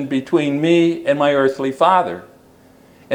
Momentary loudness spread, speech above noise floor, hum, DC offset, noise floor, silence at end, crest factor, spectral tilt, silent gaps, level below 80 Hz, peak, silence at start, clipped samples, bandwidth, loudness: 4 LU; 32 dB; none; under 0.1%; -48 dBFS; 0 s; 16 dB; -6.5 dB/octave; none; -62 dBFS; 0 dBFS; 0 s; under 0.1%; 11 kHz; -16 LUFS